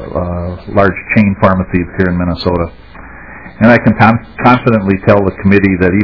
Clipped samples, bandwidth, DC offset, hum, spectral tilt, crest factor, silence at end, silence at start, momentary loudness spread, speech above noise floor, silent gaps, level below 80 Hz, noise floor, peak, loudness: 2%; 5.4 kHz; 1%; none; -9.5 dB/octave; 12 dB; 0 s; 0 s; 10 LU; 22 dB; none; -32 dBFS; -32 dBFS; 0 dBFS; -11 LUFS